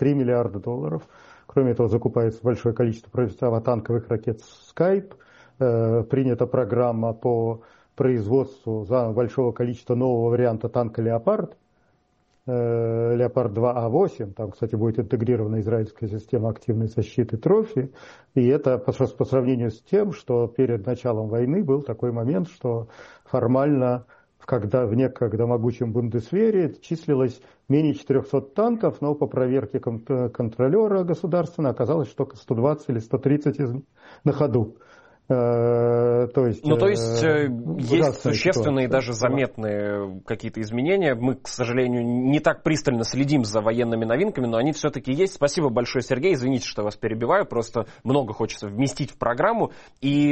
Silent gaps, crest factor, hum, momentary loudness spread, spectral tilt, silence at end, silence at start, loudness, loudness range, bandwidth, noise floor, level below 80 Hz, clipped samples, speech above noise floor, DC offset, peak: none; 16 dB; none; 7 LU; -7 dB/octave; 0 s; 0 s; -23 LUFS; 3 LU; 8.4 kHz; -65 dBFS; -56 dBFS; under 0.1%; 43 dB; under 0.1%; -6 dBFS